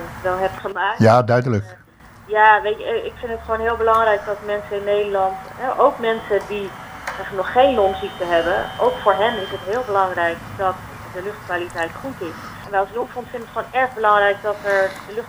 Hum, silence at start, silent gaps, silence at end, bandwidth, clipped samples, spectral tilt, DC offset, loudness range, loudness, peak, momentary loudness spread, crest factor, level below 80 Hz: none; 0 s; none; 0 s; over 20 kHz; under 0.1%; -6 dB/octave; under 0.1%; 6 LU; -19 LUFS; 0 dBFS; 14 LU; 20 dB; -46 dBFS